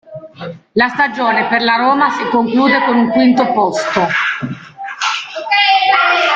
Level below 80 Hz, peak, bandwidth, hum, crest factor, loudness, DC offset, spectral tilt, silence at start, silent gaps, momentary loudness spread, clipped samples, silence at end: -56 dBFS; 0 dBFS; 7.8 kHz; none; 12 dB; -13 LUFS; under 0.1%; -4 dB/octave; 0.1 s; none; 15 LU; under 0.1%; 0 s